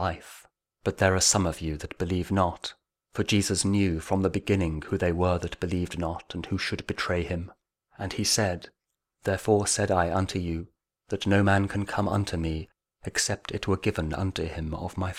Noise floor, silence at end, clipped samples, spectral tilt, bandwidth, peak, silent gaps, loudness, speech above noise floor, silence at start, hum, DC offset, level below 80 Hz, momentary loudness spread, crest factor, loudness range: -73 dBFS; 0 s; under 0.1%; -4.5 dB/octave; 15.5 kHz; -8 dBFS; none; -27 LUFS; 46 dB; 0 s; none; under 0.1%; -46 dBFS; 12 LU; 20 dB; 4 LU